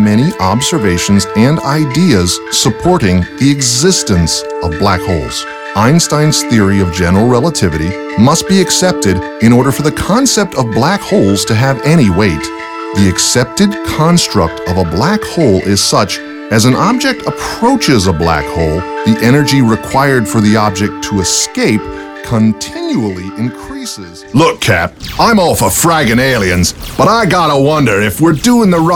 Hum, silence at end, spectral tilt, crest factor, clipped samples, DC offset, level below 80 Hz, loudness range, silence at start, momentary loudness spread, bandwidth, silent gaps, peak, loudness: none; 0 s; -4.5 dB/octave; 10 dB; 0.5%; under 0.1%; -32 dBFS; 3 LU; 0 s; 8 LU; 18.5 kHz; none; 0 dBFS; -10 LUFS